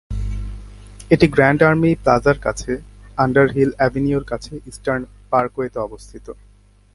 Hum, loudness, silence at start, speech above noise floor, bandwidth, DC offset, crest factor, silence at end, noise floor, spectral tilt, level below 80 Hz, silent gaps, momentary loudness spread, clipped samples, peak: 50 Hz at -40 dBFS; -18 LUFS; 0.1 s; 20 dB; 11.5 kHz; under 0.1%; 18 dB; 0.6 s; -38 dBFS; -7 dB/octave; -34 dBFS; none; 20 LU; under 0.1%; 0 dBFS